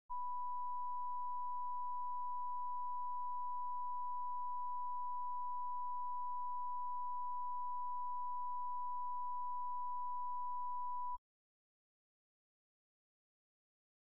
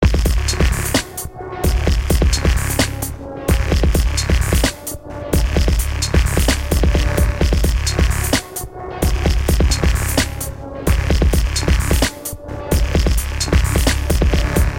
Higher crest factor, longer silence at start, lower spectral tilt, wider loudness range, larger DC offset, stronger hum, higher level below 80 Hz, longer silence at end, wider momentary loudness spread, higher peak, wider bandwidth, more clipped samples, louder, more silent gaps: second, 4 dB vs 14 dB; about the same, 0.1 s vs 0 s; second, -2.5 dB/octave vs -4.5 dB/octave; first, 4 LU vs 1 LU; first, 0.6% vs under 0.1%; neither; second, -76 dBFS vs -18 dBFS; first, 2.85 s vs 0 s; second, 0 LU vs 10 LU; second, -36 dBFS vs -2 dBFS; second, 1.7 kHz vs 17 kHz; neither; second, -43 LUFS vs -18 LUFS; neither